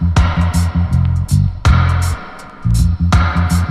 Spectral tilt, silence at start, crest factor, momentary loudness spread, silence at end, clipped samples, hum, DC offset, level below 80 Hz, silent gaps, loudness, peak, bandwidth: -6 dB/octave; 0 s; 12 dB; 7 LU; 0 s; under 0.1%; none; under 0.1%; -18 dBFS; none; -15 LUFS; 0 dBFS; 13.5 kHz